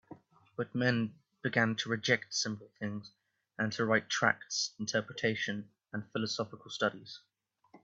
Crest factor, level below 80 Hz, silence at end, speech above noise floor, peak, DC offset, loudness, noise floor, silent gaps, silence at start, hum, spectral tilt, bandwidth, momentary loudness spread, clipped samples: 24 dB; -74 dBFS; 0.05 s; 30 dB; -10 dBFS; under 0.1%; -34 LUFS; -64 dBFS; none; 0.1 s; none; -4 dB/octave; 8 kHz; 14 LU; under 0.1%